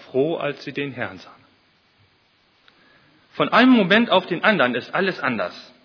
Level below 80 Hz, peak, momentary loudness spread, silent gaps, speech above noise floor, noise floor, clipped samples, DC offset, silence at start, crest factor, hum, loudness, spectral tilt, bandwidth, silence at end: -68 dBFS; 0 dBFS; 14 LU; none; 41 dB; -61 dBFS; under 0.1%; under 0.1%; 0.15 s; 22 dB; none; -19 LUFS; -6.5 dB/octave; 5.4 kHz; 0.2 s